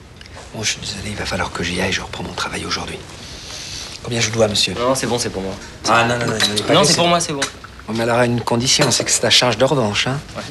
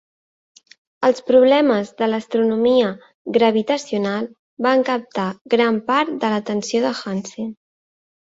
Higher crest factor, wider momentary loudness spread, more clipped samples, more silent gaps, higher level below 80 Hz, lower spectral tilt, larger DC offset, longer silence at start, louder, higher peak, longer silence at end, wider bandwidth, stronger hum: about the same, 18 dB vs 16 dB; first, 16 LU vs 12 LU; neither; second, none vs 3.14-3.25 s, 4.39-4.57 s, 5.41-5.45 s; first, -42 dBFS vs -64 dBFS; second, -3 dB/octave vs -5 dB/octave; neither; second, 0 s vs 1 s; about the same, -17 LUFS vs -19 LUFS; about the same, 0 dBFS vs -2 dBFS; second, 0 s vs 0.75 s; first, 13.5 kHz vs 7.8 kHz; neither